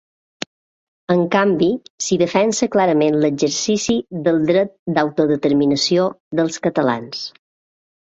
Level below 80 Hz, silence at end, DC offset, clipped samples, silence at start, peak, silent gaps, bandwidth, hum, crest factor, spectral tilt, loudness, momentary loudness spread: -58 dBFS; 0.9 s; under 0.1%; under 0.1%; 1.1 s; -2 dBFS; 1.90-1.98 s, 4.79-4.86 s, 6.20-6.31 s; 8.2 kHz; none; 16 dB; -4.5 dB/octave; -18 LUFS; 13 LU